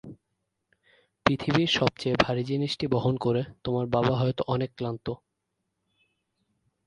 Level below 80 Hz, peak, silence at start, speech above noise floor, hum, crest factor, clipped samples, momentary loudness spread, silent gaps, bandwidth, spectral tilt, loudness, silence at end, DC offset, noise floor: -54 dBFS; -4 dBFS; 0.05 s; 54 dB; none; 24 dB; under 0.1%; 8 LU; none; 10.5 kHz; -6.5 dB/octave; -27 LUFS; 1.7 s; under 0.1%; -81 dBFS